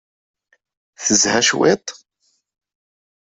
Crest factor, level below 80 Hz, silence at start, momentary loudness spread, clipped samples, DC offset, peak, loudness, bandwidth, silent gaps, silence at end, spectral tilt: 20 dB; -60 dBFS; 1 s; 10 LU; under 0.1%; under 0.1%; 0 dBFS; -16 LUFS; 8.4 kHz; none; 1.35 s; -2 dB/octave